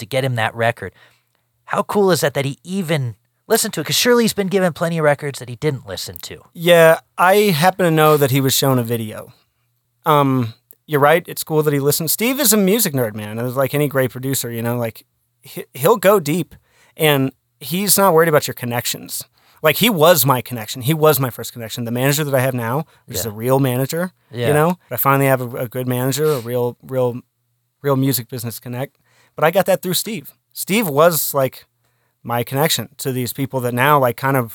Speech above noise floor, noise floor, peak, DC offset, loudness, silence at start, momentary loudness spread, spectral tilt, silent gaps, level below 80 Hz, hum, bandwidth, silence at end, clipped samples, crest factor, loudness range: 51 dB; -68 dBFS; 0 dBFS; under 0.1%; -17 LUFS; 0 s; 14 LU; -4.5 dB/octave; none; -60 dBFS; none; over 20 kHz; 0 s; under 0.1%; 18 dB; 5 LU